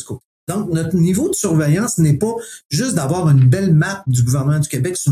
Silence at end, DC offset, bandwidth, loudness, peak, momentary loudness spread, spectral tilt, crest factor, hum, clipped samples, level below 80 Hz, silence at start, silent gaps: 0 s; under 0.1%; 15 kHz; -16 LUFS; -4 dBFS; 10 LU; -6 dB/octave; 12 dB; none; under 0.1%; -46 dBFS; 0 s; 0.25-0.47 s, 2.65-2.70 s